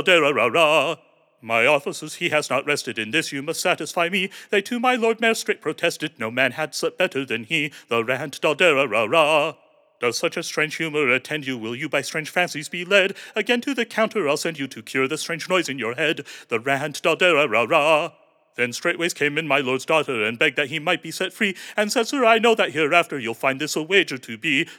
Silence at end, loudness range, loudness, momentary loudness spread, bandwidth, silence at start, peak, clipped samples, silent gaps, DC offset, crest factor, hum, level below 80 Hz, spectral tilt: 0 s; 3 LU; -21 LUFS; 9 LU; 18.5 kHz; 0 s; -2 dBFS; under 0.1%; none; under 0.1%; 20 dB; none; under -90 dBFS; -3.5 dB/octave